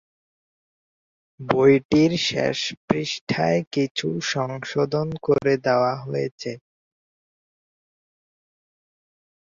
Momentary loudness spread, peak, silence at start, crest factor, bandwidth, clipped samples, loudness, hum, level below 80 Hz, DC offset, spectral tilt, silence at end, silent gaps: 10 LU; -2 dBFS; 1.4 s; 22 dB; 7.6 kHz; under 0.1%; -22 LUFS; none; -58 dBFS; under 0.1%; -5.5 dB/octave; 2.95 s; 1.85-1.89 s, 2.77-2.88 s, 3.21-3.27 s, 3.67-3.71 s, 3.91-3.95 s, 6.31-6.38 s